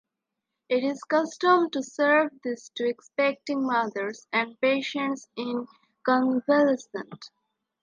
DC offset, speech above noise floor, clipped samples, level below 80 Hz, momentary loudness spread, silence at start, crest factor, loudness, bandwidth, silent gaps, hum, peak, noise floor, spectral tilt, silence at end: under 0.1%; 59 dB; under 0.1%; -82 dBFS; 12 LU; 0.7 s; 18 dB; -26 LUFS; 9.6 kHz; none; none; -8 dBFS; -85 dBFS; -4 dB/octave; 0.55 s